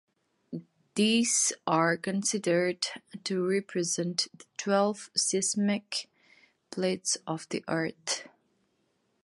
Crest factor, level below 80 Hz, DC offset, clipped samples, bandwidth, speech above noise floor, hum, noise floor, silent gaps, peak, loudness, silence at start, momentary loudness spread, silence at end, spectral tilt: 18 dB; -78 dBFS; under 0.1%; under 0.1%; 11.5 kHz; 45 dB; none; -74 dBFS; none; -12 dBFS; -29 LUFS; 0.5 s; 12 LU; 0.95 s; -3 dB/octave